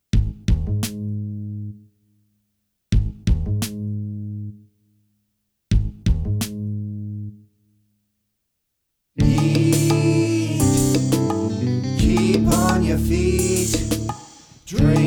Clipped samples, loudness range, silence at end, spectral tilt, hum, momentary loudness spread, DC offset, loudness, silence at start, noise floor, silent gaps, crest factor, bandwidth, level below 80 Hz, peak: under 0.1%; 9 LU; 0 s; -6 dB/octave; none; 15 LU; under 0.1%; -21 LUFS; 0.15 s; -74 dBFS; none; 18 dB; over 20 kHz; -30 dBFS; -4 dBFS